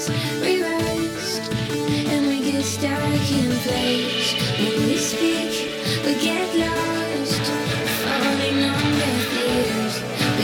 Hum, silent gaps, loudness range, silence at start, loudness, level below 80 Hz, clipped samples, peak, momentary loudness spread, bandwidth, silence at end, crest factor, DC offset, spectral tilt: none; none; 1 LU; 0 s; -21 LUFS; -48 dBFS; under 0.1%; -8 dBFS; 4 LU; 18.5 kHz; 0 s; 14 dB; under 0.1%; -4 dB/octave